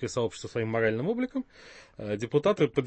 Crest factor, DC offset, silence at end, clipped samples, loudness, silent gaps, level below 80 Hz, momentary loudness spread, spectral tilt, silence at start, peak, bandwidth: 18 dB; under 0.1%; 0 s; under 0.1%; -29 LUFS; none; -60 dBFS; 18 LU; -6 dB/octave; 0 s; -10 dBFS; 8.8 kHz